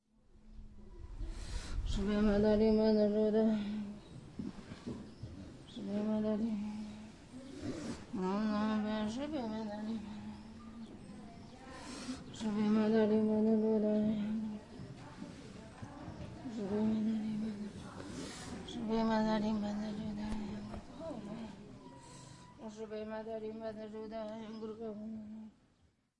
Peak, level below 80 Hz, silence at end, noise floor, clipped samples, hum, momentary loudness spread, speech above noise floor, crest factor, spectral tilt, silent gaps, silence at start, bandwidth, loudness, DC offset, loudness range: -20 dBFS; -52 dBFS; 0.7 s; -73 dBFS; under 0.1%; none; 21 LU; 41 dB; 16 dB; -7 dB/octave; none; 0.35 s; 11 kHz; -36 LUFS; under 0.1%; 12 LU